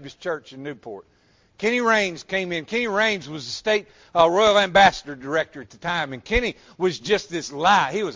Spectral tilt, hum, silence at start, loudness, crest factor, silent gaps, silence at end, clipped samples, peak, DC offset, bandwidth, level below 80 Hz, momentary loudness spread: -3.5 dB/octave; none; 0 s; -21 LUFS; 20 dB; none; 0 s; under 0.1%; -2 dBFS; under 0.1%; 7.6 kHz; -44 dBFS; 16 LU